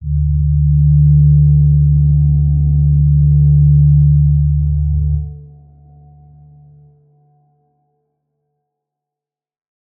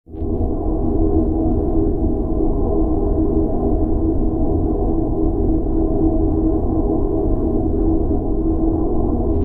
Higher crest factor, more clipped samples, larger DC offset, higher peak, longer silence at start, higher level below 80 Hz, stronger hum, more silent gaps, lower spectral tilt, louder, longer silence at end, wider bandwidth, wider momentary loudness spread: about the same, 10 dB vs 12 dB; neither; neither; about the same, -2 dBFS vs -4 dBFS; about the same, 0 s vs 0.1 s; about the same, -20 dBFS vs -20 dBFS; neither; neither; first, -20 dB/octave vs -14 dB/octave; first, -12 LUFS vs -19 LUFS; first, 4.6 s vs 0 s; second, 0.8 kHz vs 1.7 kHz; first, 7 LU vs 2 LU